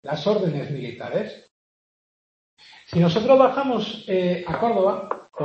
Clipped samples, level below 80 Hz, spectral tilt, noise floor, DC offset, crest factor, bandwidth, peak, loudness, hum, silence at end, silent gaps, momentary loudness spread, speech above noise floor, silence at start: under 0.1%; -60 dBFS; -7.5 dB/octave; under -90 dBFS; under 0.1%; 20 dB; 7.2 kHz; -2 dBFS; -22 LUFS; none; 0 s; 1.51-2.57 s; 14 LU; over 69 dB; 0.05 s